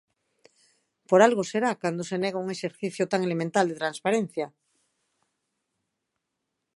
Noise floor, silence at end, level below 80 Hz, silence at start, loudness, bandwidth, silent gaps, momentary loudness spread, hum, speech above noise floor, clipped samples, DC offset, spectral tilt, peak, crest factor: -82 dBFS; 2.25 s; -78 dBFS; 1.1 s; -26 LUFS; 11.5 kHz; none; 13 LU; none; 57 dB; under 0.1%; under 0.1%; -5 dB/octave; -4 dBFS; 24 dB